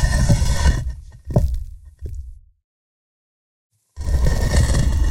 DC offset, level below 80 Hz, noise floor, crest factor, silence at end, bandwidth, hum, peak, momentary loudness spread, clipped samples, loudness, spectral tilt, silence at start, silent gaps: under 0.1%; -22 dBFS; under -90 dBFS; 18 dB; 0 s; 16 kHz; none; -2 dBFS; 19 LU; under 0.1%; -20 LUFS; -5.5 dB/octave; 0 s; 2.64-3.70 s